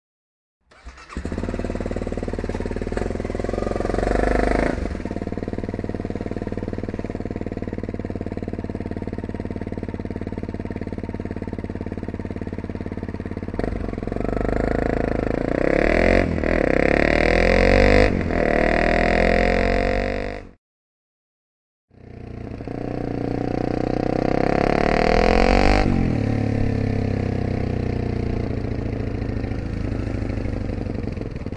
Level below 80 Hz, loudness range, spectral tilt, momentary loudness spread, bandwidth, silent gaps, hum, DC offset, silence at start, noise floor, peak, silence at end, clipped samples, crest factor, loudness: -30 dBFS; 12 LU; -7 dB/octave; 13 LU; 9.8 kHz; 20.58-21.88 s; none; under 0.1%; 0.85 s; -42 dBFS; 0 dBFS; 0 s; under 0.1%; 22 dB; -23 LUFS